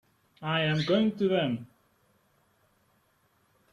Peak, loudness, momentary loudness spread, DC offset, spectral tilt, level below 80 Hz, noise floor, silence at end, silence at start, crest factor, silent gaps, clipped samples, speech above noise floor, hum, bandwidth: -14 dBFS; -28 LUFS; 10 LU; under 0.1%; -7 dB/octave; -68 dBFS; -69 dBFS; 2.1 s; 0.4 s; 18 dB; none; under 0.1%; 42 dB; none; 8.8 kHz